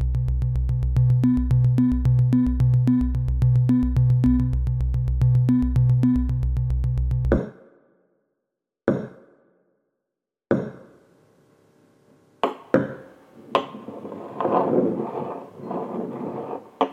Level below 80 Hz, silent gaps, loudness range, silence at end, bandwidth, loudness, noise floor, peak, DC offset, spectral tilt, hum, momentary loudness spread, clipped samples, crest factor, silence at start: -30 dBFS; none; 12 LU; 0 s; 4.2 kHz; -22 LUFS; -84 dBFS; -4 dBFS; under 0.1%; -10 dB/octave; none; 14 LU; under 0.1%; 18 dB; 0 s